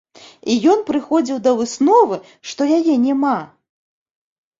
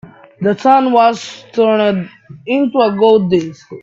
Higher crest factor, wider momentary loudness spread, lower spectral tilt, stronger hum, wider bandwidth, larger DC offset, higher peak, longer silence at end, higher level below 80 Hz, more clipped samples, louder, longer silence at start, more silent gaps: about the same, 16 dB vs 14 dB; second, 10 LU vs 14 LU; second, -4.5 dB/octave vs -6.5 dB/octave; neither; about the same, 7.8 kHz vs 7.8 kHz; neither; about the same, -2 dBFS vs 0 dBFS; first, 1.15 s vs 0.05 s; second, -62 dBFS vs -56 dBFS; neither; second, -16 LUFS vs -13 LUFS; about the same, 0.45 s vs 0.4 s; neither